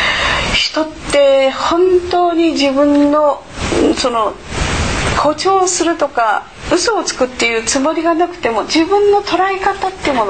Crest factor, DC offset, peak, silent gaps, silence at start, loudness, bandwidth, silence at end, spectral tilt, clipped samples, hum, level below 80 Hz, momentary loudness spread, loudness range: 12 dB; 0.5%; -2 dBFS; none; 0 s; -14 LUFS; 9.2 kHz; 0 s; -3.5 dB/octave; under 0.1%; none; -32 dBFS; 6 LU; 2 LU